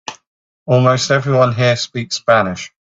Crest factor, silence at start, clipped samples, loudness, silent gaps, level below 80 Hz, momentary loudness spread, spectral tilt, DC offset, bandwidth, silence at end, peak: 16 dB; 0.1 s; under 0.1%; -15 LUFS; 0.27-0.66 s; -54 dBFS; 14 LU; -5 dB/octave; under 0.1%; 7.8 kHz; 0.3 s; 0 dBFS